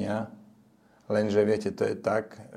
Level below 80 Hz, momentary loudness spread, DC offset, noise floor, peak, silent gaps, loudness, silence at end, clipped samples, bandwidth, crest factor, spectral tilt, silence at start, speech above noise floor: -70 dBFS; 8 LU; under 0.1%; -60 dBFS; -10 dBFS; none; -28 LUFS; 0 s; under 0.1%; 11.5 kHz; 18 dB; -6.5 dB/octave; 0 s; 33 dB